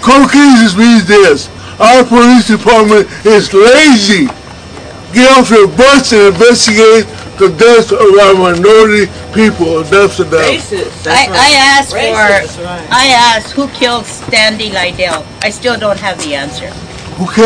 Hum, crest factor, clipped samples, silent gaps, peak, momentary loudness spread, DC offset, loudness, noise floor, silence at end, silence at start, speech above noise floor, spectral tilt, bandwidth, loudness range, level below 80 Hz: none; 6 dB; 3%; none; 0 dBFS; 12 LU; under 0.1%; -6 LUFS; -27 dBFS; 0 s; 0 s; 21 dB; -3.5 dB/octave; 11 kHz; 5 LU; -36 dBFS